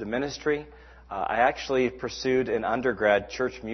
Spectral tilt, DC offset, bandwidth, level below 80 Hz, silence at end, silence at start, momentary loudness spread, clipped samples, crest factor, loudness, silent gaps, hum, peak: -5 dB/octave; under 0.1%; 6.4 kHz; -52 dBFS; 0 s; 0 s; 7 LU; under 0.1%; 18 dB; -26 LUFS; none; none; -8 dBFS